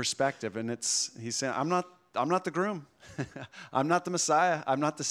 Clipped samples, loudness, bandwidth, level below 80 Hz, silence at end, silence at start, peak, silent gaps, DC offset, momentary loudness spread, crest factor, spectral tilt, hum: under 0.1%; -30 LUFS; 15.5 kHz; -74 dBFS; 0 s; 0 s; -12 dBFS; none; under 0.1%; 13 LU; 18 dB; -3.5 dB/octave; none